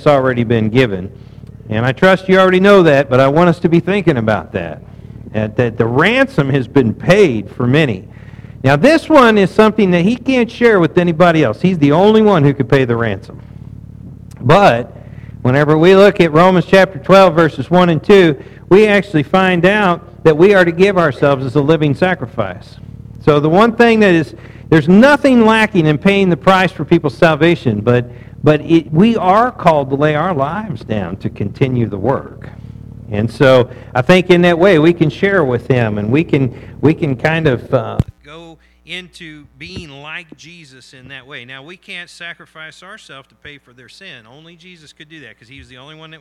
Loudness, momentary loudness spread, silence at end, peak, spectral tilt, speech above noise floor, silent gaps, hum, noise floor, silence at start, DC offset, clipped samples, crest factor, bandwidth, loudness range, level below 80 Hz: -12 LUFS; 18 LU; 0.15 s; 0 dBFS; -7 dB/octave; 21 dB; none; none; -33 dBFS; 0 s; under 0.1%; under 0.1%; 12 dB; 13 kHz; 14 LU; -40 dBFS